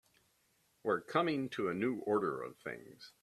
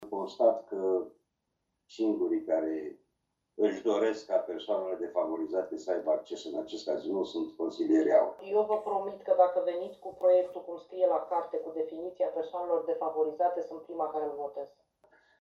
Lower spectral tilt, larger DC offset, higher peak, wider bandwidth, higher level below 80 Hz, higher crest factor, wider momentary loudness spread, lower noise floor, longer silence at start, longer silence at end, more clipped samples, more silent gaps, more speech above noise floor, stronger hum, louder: about the same, -6.5 dB/octave vs -5.5 dB/octave; neither; second, -16 dBFS vs -10 dBFS; first, 13.5 kHz vs 7.6 kHz; about the same, -78 dBFS vs -76 dBFS; about the same, 22 dB vs 20 dB; about the same, 13 LU vs 12 LU; second, -75 dBFS vs -82 dBFS; first, 0.85 s vs 0 s; second, 0.15 s vs 0.75 s; neither; neither; second, 38 dB vs 52 dB; neither; second, -37 LUFS vs -31 LUFS